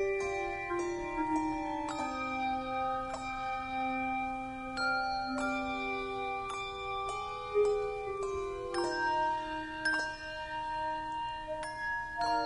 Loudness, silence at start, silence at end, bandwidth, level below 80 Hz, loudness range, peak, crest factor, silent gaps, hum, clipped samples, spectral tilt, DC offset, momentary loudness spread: -35 LUFS; 0 s; 0 s; 10.5 kHz; -54 dBFS; 2 LU; -20 dBFS; 14 dB; none; none; under 0.1%; -4 dB/octave; under 0.1%; 6 LU